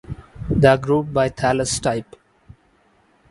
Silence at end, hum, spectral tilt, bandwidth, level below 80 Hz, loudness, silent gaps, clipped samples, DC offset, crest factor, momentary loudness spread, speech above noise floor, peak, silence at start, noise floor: 1.3 s; none; -5 dB/octave; 11.5 kHz; -40 dBFS; -19 LUFS; none; under 0.1%; under 0.1%; 20 dB; 14 LU; 40 dB; 0 dBFS; 0.1 s; -58 dBFS